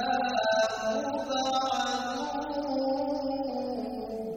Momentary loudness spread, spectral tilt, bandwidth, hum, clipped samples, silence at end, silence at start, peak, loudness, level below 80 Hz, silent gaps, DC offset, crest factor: 7 LU; -3 dB/octave; over 20 kHz; none; under 0.1%; 0 s; 0 s; -14 dBFS; -30 LUFS; -60 dBFS; none; under 0.1%; 16 dB